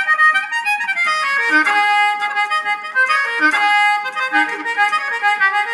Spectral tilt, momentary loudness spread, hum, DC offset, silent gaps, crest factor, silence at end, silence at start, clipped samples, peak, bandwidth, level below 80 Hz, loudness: 0 dB/octave; 5 LU; none; under 0.1%; none; 14 dB; 0 s; 0 s; under 0.1%; -2 dBFS; 12.5 kHz; -88 dBFS; -15 LUFS